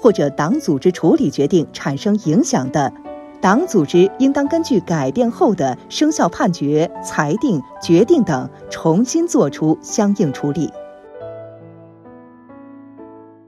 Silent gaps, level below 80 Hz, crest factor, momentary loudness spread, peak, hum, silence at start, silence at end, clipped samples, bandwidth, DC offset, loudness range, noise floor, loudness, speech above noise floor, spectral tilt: none; -54 dBFS; 16 dB; 10 LU; 0 dBFS; none; 0 s; 0.25 s; under 0.1%; 13 kHz; under 0.1%; 5 LU; -41 dBFS; -17 LUFS; 25 dB; -6 dB/octave